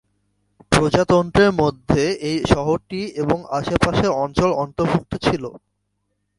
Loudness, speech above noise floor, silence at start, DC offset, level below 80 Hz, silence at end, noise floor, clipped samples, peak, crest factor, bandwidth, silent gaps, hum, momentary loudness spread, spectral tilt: -19 LUFS; 53 dB; 0.7 s; under 0.1%; -38 dBFS; 0.8 s; -72 dBFS; under 0.1%; 0 dBFS; 20 dB; 11.5 kHz; none; 50 Hz at -45 dBFS; 6 LU; -6 dB/octave